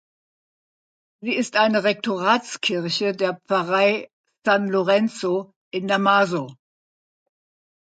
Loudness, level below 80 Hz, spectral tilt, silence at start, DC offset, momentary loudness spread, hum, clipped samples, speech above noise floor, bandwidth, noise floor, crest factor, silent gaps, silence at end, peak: -21 LUFS; -74 dBFS; -4.5 dB/octave; 1.2 s; under 0.1%; 10 LU; none; under 0.1%; over 69 dB; 9.2 kHz; under -90 dBFS; 20 dB; 4.13-4.24 s, 5.56-5.71 s; 1.3 s; -4 dBFS